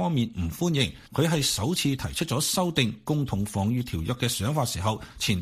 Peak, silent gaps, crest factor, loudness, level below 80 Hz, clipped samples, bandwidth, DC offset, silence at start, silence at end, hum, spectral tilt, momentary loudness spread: -8 dBFS; none; 18 dB; -26 LUFS; -46 dBFS; under 0.1%; 15.5 kHz; under 0.1%; 0 s; 0 s; none; -4.5 dB/octave; 5 LU